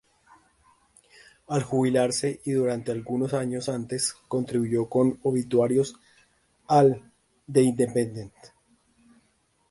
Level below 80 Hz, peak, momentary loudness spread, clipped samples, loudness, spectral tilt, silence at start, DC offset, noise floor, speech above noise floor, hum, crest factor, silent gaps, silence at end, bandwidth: -62 dBFS; -8 dBFS; 9 LU; under 0.1%; -25 LUFS; -6 dB/octave; 1.5 s; under 0.1%; -68 dBFS; 44 dB; none; 20 dB; none; 1.25 s; 11.5 kHz